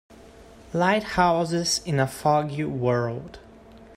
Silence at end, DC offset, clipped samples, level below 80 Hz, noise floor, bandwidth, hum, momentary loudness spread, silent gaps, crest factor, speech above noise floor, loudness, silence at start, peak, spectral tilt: 0 s; under 0.1%; under 0.1%; -52 dBFS; -48 dBFS; 15.5 kHz; none; 10 LU; none; 18 dB; 24 dB; -24 LUFS; 0.1 s; -6 dBFS; -5 dB/octave